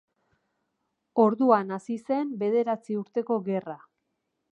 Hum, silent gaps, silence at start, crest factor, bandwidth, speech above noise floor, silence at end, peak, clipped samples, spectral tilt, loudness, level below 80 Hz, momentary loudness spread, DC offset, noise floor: none; none; 1.15 s; 20 dB; 9.4 kHz; 54 dB; 0.75 s; -8 dBFS; under 0.1%; -8 dB/octave; -26 LUFS; -82 dBFS; 11 LU; under 0.1%; -79 dBFS